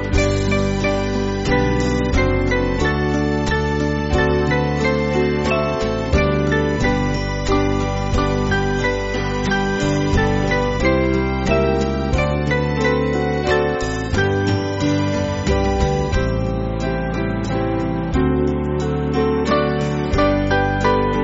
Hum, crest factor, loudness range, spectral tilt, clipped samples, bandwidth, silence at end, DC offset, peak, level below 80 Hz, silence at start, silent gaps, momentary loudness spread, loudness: none; 16 dB; 2 LU; -5.5 dB/octave; under 0.1%; 8 kHz; 0 s; under 0.1%; -2 dBFS; -26 dBFS; 0 s; none; 4 LU; -19 LUFS